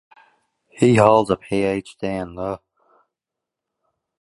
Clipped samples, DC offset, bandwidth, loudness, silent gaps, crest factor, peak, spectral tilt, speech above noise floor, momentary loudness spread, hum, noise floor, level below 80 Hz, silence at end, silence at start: under 0.1%; under 0.1%; 11.5 kHz; -19 LUFS; none; 22 dB; 0 dBFS; -6.5 dB/octave; 67 dB; 15 LU; none; -85 dBFS; -52 dBFS; 1.65 s; 0.75 s